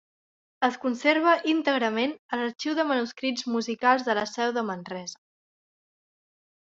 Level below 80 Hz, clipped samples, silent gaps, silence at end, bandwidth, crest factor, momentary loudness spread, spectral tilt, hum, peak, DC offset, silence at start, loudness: -76 dBFS; under 0.1%; 2.19-2.29 s; 1.5 s; 7.8 kHz; 20 dB; 9 LU; -3.5 dB/octave; none; -6 dBFS; under 0.1%; 0.6 s; -26 LUFS